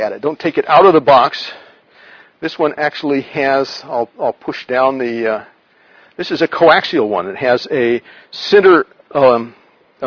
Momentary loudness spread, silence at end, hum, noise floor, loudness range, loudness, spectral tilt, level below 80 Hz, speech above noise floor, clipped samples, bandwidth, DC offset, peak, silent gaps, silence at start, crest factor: 16 LU; 0 s; none; -49 dBFS; 6 LU; -14 LUFS; -6 dB/octave; -56 dBFS; 35 dB; 0.1%; 5.4 kHz; under 0.1%; 0 dBFS; none; 0 s; 14 dB